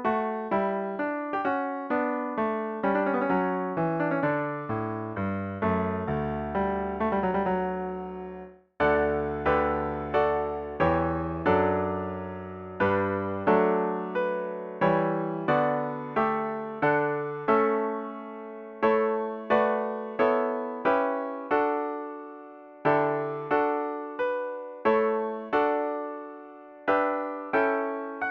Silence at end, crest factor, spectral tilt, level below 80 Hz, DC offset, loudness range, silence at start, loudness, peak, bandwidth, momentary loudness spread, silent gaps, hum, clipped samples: 0 s; 18 dB; -9 dB/octave; -52 dBFS; under 0.1%; 2 LU; 0 s; -27 LUFS; -8 dBFS; 5.8 kHz; 10 LU; none; none; under 0.1%